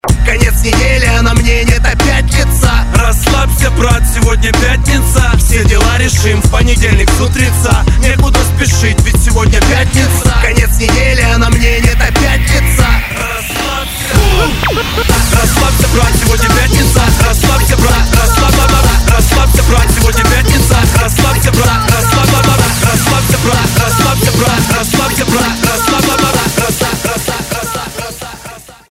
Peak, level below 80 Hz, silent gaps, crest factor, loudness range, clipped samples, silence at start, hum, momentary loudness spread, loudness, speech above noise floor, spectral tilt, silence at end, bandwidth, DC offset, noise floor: 0 dBFS; -12 dBFS; none; 8 dB; 2 LU; 0.5%; 0.05 s; none; 4 LU; -9 LUFS; 23 dB; -4 dB/octave; 0.25 s; 16.5 kHz; under 0.1%; -30 dBFS